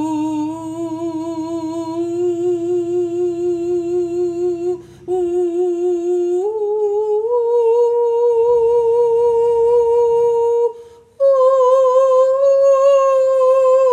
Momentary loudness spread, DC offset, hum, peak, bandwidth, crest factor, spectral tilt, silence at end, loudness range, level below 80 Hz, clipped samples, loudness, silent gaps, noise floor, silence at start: 11 LU; under 0.1%; none; -4 dBFS; 9.4 kHz; 12 dB; -6.5 dB/octave; 0 s; 6 LU; -56 dBFS; under 0.1%; -16 LUFS; none; -38 dBFS; 0 s